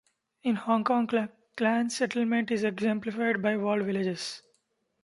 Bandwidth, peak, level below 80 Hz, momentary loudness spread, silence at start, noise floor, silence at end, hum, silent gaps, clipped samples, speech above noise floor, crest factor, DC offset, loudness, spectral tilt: 11.5 kHz; -10 dBFS; -74 dBFS; 8 LU; 0.45 s; -74 dBFS; 0.65 s; none; none; under 0.1%; 47 dB; 18 dB; under 0.1%; -29 LUFS; -5 dB/octave